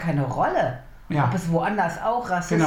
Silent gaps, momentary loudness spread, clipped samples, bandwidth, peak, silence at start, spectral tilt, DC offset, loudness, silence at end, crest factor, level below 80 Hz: none; 5 LU; under 0.1%; 15 kHz; -8 dBFS; 0 s; -6.5 dB/octave; under 0.1%; -24 LUFS; 0 s; 16 dB; -46 dBFS